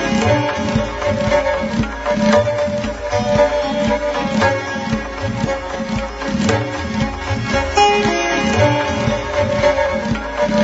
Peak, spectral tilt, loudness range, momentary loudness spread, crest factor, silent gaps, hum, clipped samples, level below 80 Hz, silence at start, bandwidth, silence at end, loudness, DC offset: -2 dBFS; -4.5 dB/octave; 3 LU; 7 LU; 16 dB; none; none; under 0.1%; -34 dBFS; 0 s; 8 kHz; 0 s; -17 LUFS; under 0.1%